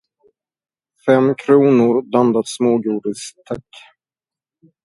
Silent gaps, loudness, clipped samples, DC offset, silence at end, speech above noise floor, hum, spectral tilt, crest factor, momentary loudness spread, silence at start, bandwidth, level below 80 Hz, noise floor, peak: none; -16 LUFS; under 0.1%; under 0.1%; 1.25 s; over 74 dB; none; -6.5 dB/octave; 18 dB; 17 LU; 1.05 s; 11.5 kHz; -62 dBFS; under -90 dBFS; 0 dBFS